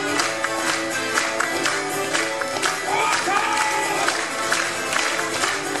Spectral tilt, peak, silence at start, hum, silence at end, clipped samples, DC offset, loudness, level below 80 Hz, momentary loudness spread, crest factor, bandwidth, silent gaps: -1 dB/octave; -4 dBFS; 0 s; none; 0 s; under 0.1%; 0.3%; -21 LUFS; -62 dBFS; 3 LU; 18 dB; 15.5 kHz; none